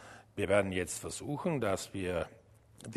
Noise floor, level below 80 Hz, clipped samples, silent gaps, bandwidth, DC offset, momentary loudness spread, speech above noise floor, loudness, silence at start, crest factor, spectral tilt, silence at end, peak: -55 dBFS; -60 dBFS; under 0.1%; none; 13.5 kHz; under 0.1%; 13 LU; 22 dB; -34 LUFS; 0 s; 22 dB; -5 dB/octave; 0 s; -14 dBFS